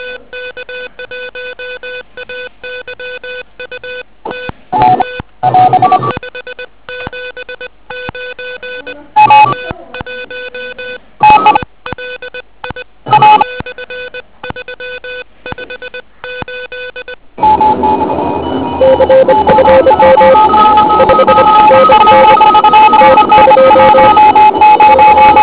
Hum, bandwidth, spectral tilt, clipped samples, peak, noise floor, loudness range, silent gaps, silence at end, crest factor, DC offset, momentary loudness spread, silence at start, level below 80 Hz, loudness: none; 4 kHz; -8.5 dB/octave; 4%; 0 dBFS; -27 dBFS; 19 LU; none; 0 s; 8 dB; 1%; 21 LU; 0 s; -36 dBFS; -6 LUFS